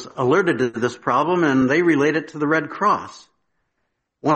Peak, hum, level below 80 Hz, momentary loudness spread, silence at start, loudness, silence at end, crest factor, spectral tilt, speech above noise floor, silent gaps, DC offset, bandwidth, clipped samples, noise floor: -4 dBFS; none; -60 dBFS; 7 LU; 0 s; -19 LUFS; 0 s; 16 dB; -6 dB/octave; 55 dB; none; under 0.1%; 8.6 kHz; under 0.1%; -74 dBFS